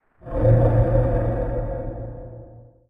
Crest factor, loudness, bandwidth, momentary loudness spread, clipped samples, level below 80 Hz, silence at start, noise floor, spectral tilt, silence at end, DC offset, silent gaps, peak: 16 dB; -21 LUFS; 2.7 kHz; 20 LU; under 0.1%; -28 dBFS; 0.25 s; -44 dBFS; -12 dB/octave; 0.3 s; under 0.1%; none; -6 dBFS